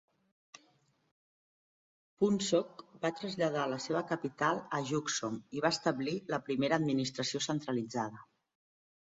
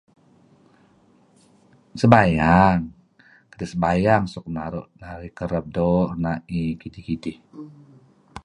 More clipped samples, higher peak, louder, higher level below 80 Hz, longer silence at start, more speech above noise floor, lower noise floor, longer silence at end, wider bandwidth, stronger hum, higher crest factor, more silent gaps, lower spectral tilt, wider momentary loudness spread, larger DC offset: neither; second, -14 dBFS vs 0 dBFS; second, -34 LUFS vs -21 LUFS; second, -76 dBFS vs -42 dBFS; first, 2.2 s vs 1.95 s; about the same, 38 dB vs 36 dB; first, -71 dBFS vs -57 dBFS; first, 0.95 s vs 0.05 s; second, 7.6 kHz vs 10.5 kHz; neither; about the same, 20 dB vs 22 dB; neither; second, -4 dB/octave vs -8 dB/octave; second, 7 LU vs 22 LU; neither